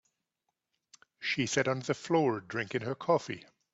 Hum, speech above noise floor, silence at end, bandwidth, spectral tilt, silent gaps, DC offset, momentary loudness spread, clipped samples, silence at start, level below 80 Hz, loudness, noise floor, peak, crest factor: none; 54 dB; 0.35 s; 8.2 kHz; -4.5 dB/octave; none; under 0.1%; 8 LU; under 0.1%; 1.2 s; -72 dBFS; -31 LUFS; -85 dBFS; -14 dBFS; 20 dB